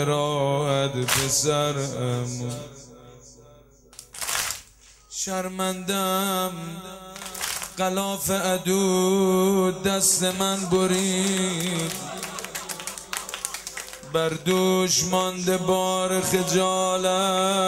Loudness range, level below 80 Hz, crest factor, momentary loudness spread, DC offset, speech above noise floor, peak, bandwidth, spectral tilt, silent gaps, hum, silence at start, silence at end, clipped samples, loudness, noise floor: 8 LU; -56 dBFS; 20 dB; 12 LU; under 0.1%; 29 dB; -4 dBFS; 16 kHz; -3.5 dB/octave; none; none; 0 s; 0 s; under 0.1%; -24 LUFS; -52 dBFS